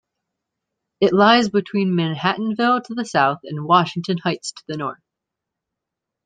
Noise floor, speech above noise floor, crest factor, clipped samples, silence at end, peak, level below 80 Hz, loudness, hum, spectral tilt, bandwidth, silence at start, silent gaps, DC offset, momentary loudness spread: -83 dBFS; 65 dB; 20 dB; under 0.1%; 1.3 s; -2 dBFS; -64 dBFS; -19 LUFS; none; -5.5 dB/octave; 9.4 kHz; 1 s; none; under 0.1%; 14 LU